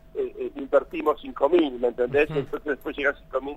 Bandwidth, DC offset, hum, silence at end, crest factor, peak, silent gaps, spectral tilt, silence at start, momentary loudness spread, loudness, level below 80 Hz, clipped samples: 15 kHz; under 0.1%; none; 0 s; 18 dB; -6 dBFS; none; -7 dB/octave; 0.15 s; 9 LU; -25 LUFS; -50 dBFS; under 0.1%